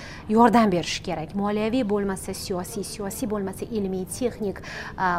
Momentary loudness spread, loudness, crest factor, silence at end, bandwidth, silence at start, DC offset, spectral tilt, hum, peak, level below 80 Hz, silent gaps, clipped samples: 13 LU; -25 LUFS; 20 dB; 0 s; 16 kHz; 0 s; under 0.1%; -5 dB/octave; none; -4 dBFS; -46 dBFS; none; under 0.1%